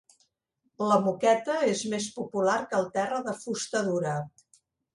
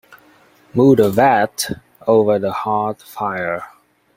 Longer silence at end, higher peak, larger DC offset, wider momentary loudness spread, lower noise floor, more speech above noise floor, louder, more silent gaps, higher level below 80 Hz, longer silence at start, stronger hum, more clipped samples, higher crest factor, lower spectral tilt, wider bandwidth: first, 0.65 s vs 0.5 s; second, -8 dBFS vs 0 dBFS; neither; second, 8 LU vs 12 LU; first, -76 dBFS vs -51 dBFS; first, 49 dB vs 35 dB; second, -28 LUFS vs -17 LUFS; neither; second, -72 dBFS vs -56 dBFS; about the same, 0.8 s vs 0.75 s; neither; neither; about the same, 20 dB vs 16 dB; about the same, -4.5 dB/octave vs -5.5 dB/octave; second, 11.5 kHz vs 16.5 kHz